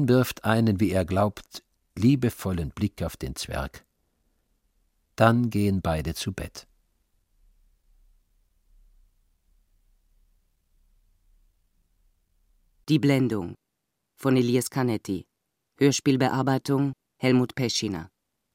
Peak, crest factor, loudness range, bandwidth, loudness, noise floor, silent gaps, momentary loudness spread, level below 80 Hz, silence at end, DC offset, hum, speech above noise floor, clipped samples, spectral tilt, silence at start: -4 dBFS; 24 dB; 7 LU; 16.5 kHz; -25 LUFS; -81 dBFS; none; 15 LU; -48 dBFS; 0.5 s; under 0.1%; none; 57 dB; under 0.1%; -6 dB/octave; 0 s